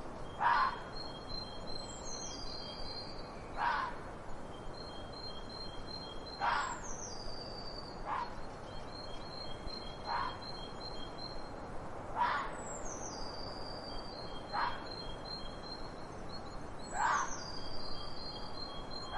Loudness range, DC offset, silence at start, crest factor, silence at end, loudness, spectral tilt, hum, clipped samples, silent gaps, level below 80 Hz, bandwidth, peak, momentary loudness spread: 3 LU; under 0.1%; 0 s; 22 dB; 0 s; -41 LUFS; -3 dB/octave; none; under 0.1%; none; -50 dBFS; 11.5 kHz; -18 dBFS; 12 LU